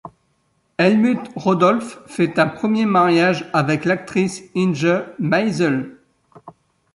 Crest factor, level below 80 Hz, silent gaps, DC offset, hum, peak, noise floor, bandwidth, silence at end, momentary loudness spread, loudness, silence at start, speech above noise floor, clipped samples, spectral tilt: 16 dB; -60 dBFS; none; under 0.1%; none; -2 dBFS; -65 dBFS; 11.5 kHz; 0.45 s; 7 LU; -18 LUFS; 0.05 s; 47 dB; under 0.1%; -6.5 dB/octave